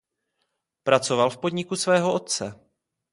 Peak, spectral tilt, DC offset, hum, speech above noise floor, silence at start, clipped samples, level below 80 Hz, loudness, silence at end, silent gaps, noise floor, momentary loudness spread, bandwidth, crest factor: -2 dBFS; -4 dB/octave; under 0.1%; none; 54 dB; 0.85 s; under 0.1%; -66 dBFS; -23 LUFS; 0.6 s; none; -77 dBFS; 8 LU; 11.5 kHz; 24 dB